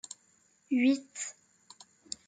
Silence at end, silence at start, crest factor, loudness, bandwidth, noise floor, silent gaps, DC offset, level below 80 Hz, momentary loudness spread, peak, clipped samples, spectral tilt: 0.95 s; 0.1 s; 18 dB; -31 LUFS; 9.4 kHz; -68 dBFS; none; under 0.1%; -84 dBFS; 20 LU; -16 dBFS; under 0.1%; -2.5 dB/octave